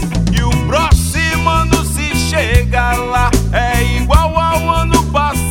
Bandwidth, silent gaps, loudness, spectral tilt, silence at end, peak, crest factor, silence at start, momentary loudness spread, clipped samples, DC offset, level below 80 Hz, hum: 17 kHz; none; -13 LUFS; -5 dB/octave; 0 s; 0 dBFS; 12 dB; 0 s; 2 LU; under 0.1%; under 0.1%; -18 dBFS; none